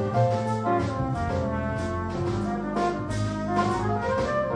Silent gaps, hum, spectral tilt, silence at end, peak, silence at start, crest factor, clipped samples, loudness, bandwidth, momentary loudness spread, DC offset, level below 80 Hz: none; none; -7 dB/octave; 0 s; -10 dBFS; 0 s; 16 dB; under 0.1%; -27 LUFS; 10.5 kHz; 4 LU; under 0.1%; -42 dBFS